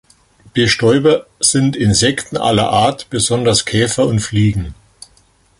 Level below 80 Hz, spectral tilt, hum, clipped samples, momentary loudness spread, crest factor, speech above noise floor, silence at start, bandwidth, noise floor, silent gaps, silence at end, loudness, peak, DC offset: -38 dBFS; -4 dB/octave; none; under 0.1%; 5 LU; 16 dB; 39 dB; 0.55 s; 11.5 kHz; -53 dBFS; none; 0.85 s; -14 LUFS; 0 dBFS; under 0.1%